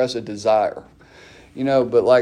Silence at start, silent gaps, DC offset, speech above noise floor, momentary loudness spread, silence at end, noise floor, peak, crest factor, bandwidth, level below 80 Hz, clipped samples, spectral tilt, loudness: 0 s; none; under 0.1%; 28 dB; 17 LU; 0 s; -46 dBFS; -4 dBFS; 16 dB; 10.5 kHz; -56 dBFS; under 0.1%; -5.5 dB/octave; -19 LUFS